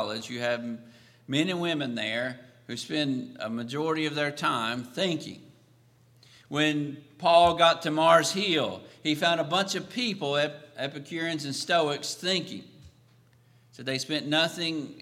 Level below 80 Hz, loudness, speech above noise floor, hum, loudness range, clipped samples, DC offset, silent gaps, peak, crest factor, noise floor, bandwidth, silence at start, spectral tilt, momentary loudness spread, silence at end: -66 dBFS; -27 LUFS; 33 dB; none; 7 LU; under 0.1%; under 0.1%; none; -6 dBFS; 24 dB; -60 dBFS; 15.5 kHz; 0 s; -4 dB/octave; 14 LU; 0 s